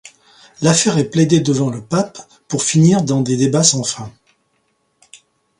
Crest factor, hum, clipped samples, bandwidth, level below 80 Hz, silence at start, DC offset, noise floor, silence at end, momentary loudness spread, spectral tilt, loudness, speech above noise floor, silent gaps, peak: 16 dB; none; under 0.1%; 11.5 kHz; -54 dBFS; 0.05 s; under 0.1%; -64 dBFS; 1.5 s; 11 LU; -4.5 dB/octave; -15 LUFS; 50 dB; none; 0 dBFS